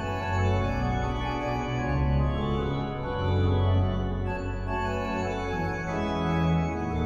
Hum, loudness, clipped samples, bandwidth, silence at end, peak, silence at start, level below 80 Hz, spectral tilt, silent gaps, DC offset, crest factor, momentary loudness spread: none; -28 LUFS; under 0.1%; 7.4 kHz; 0 s; -14 dBFS; 0 s; -36 dBFS; -7.5 dB/octave; none; under 0.1%; 14 dB; 5 LU